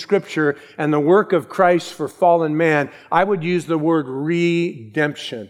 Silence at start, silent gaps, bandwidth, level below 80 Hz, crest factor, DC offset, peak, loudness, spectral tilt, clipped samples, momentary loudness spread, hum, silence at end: 0 s; none; 13 kHz; -66 dBFS; 16 dB; under 0.1%; -2 dBFS; -19 LUFS; -6.5 dB/octave; under 0.1%; 6 LU; none; 0.05 s